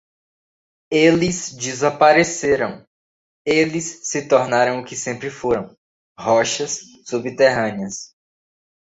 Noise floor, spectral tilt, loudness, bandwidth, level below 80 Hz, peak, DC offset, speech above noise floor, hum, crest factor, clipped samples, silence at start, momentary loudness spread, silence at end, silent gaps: under -90 dBFS; -4 dB/octave; -19 LUFS; 8 kHz; -54 dBFS; -2 dBFS; under 0.1%; over 72 dB; none; 18 dB; under 0.1%; 0.9 s; 13 LU; 0.8 s; 2.87-3.45 s, 5.78-6.15 s